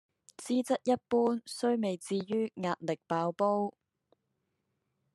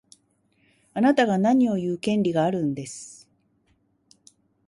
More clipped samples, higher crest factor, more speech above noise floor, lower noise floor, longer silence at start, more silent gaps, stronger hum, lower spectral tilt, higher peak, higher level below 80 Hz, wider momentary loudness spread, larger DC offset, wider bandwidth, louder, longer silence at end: neither; about the same, 18 dB vs 18 dB; first, 50 dB vs 45 dB; first, -81 dBFS vs -67 dBFS; second, 0.4 s vs 0.95 s; neither; neither; about the same, -5.5 dB/octave vs -6 dB/octave; second, -16 dBFS vs -6 dBFS; second, -80 dBFS vs -66 dBFS; second, 6 LU vs 16 LU; neither; about the same, 12.5 kHz vs 11.5 kHz; second, -32 LUFS vs -23 LUFS; about the same, 1.45 s vs 1.55 s